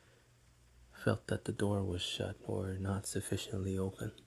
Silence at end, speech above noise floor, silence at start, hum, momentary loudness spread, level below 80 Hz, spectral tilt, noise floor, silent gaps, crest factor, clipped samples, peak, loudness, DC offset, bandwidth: 0.05 s; 28 dB; 0.8 s; none; 4 LU; -54 dBFS; -5 dB/octave; -66 dBFS; none; 22 dB; under 0.1%; -16 dBFS; -38 LUFS; under 0.1%; 12.5 kHz